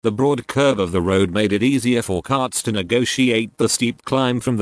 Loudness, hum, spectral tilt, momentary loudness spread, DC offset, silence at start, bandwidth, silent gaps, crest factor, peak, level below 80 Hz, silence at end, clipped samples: -19 LUFS; none; -4.5 dB/octave; 3 LU; under 0.1%; 0.05 s; 11 kHz; none; 14 dB; -4 dBFS; -50 dBFS; 0 s; under 0.1%